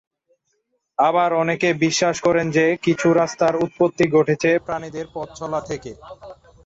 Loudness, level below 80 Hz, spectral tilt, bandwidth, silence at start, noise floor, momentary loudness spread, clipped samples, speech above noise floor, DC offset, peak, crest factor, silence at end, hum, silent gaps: -19 LUFS; -56 dBFS; -5 dB/octave; 8 kHz; 1 s; -71 dBFS; 14 LU; under 0.1%; 52 dB; under 0.1%; -6 dBFS; 16 dB; 0.3 s; none; none